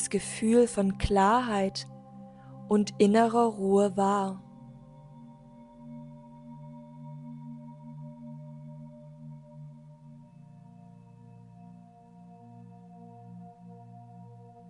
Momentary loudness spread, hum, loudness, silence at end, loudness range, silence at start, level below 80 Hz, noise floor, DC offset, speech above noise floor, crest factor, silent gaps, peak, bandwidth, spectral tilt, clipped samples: 27 LU; none; -26 LUFS; 0.35 s; 24 LU; 0 s; -54 dBFS; -52 dBFS; under 0.1%; 27 dB; 22 dB; none; -8 dBFS; 11 kHz; -5.5 dB/octave; under 0.1%